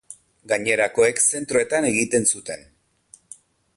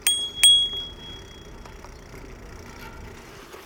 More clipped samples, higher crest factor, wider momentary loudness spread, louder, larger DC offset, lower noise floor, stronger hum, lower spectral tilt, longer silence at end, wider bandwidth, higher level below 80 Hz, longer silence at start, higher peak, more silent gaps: neither; second, 18 dB vs 24 dB; second, 10 LU vs 29 LU; second, -20 LUFS vs -17 LUFS; neither; first, -54 dBFS vs -43 dBFS; neither; first, -2.5 dB/octave vs 0.5 dB/octave; first, 1.2 s vs 0.05 s; second, 11.5 kHz vs 19 kHz; second, -60 dBFS vs -46 dBFS; about the same, 0.1 s vs 0.05 s; about the same, -4 dBFS vs -2 dBFS; neither